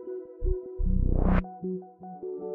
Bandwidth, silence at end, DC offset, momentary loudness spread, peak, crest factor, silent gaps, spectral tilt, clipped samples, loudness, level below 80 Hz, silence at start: 3.2 kHz; 0 s; under 0.1%; 13 LU; -10 dBFS; 18 dB; none; -9.5 dB/octave; under 0.1%; -31 LUFS; -30 dBFS; 0 s